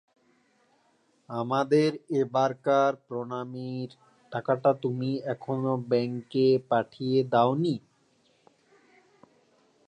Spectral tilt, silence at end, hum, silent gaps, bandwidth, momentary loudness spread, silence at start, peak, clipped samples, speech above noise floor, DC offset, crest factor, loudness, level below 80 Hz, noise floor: -7.5 dB/octave; 2.1 s; none; none; 10.5 kHz; 12 LU; 1.3 s; -10 dBFS; under 0.1%; 41 dB; under 0.1%; 18 dB; -27 LUFS; -76 dBFS; -68 dBFS